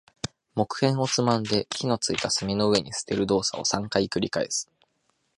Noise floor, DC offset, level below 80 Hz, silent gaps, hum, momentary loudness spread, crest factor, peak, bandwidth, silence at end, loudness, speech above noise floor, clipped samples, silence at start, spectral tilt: -72 dBFS; under 0.1%; -56 dBFS; none; none; 7 LU; 20 dB; -6 dBFS; 11.5 kHz; 0.75 s; -25 LUFS; 47 dB; under 0.1%; 0.25 s; -4 dB/octave